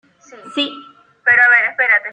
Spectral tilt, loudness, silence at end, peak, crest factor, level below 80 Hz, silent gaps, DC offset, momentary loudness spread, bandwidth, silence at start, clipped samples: -2.5 dB/octave; -13 LUFS; 0 s; -2 dBFS; 14 dB; -74 dBFS; none; under 0.1%; 13 LU; 9.4 kHz; 0.3 s; under 0.1%